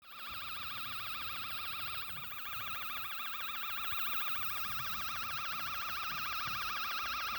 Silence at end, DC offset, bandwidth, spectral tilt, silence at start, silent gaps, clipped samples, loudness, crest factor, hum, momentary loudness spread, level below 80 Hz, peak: 0 s; under 0.1%; over 20 kHz; -1 dB/octave; 0 s; none; under 0.1%; -36 LUFS; 16 dB; none; 6 LU; -66 dBFS; -22 dBFS